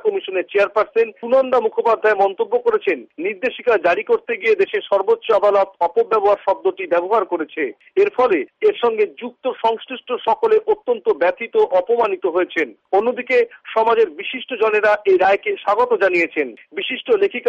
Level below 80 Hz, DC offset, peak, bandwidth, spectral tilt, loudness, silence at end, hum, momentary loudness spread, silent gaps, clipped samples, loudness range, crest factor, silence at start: -62 dBFS; under 0.1%; -6 dBFS; 7.2 kHz; -5 dB/octave; -18 LUFS; 0 s; none; 7 LU; none; under 0.1%; 2 LU; 12 dB; 0.05 s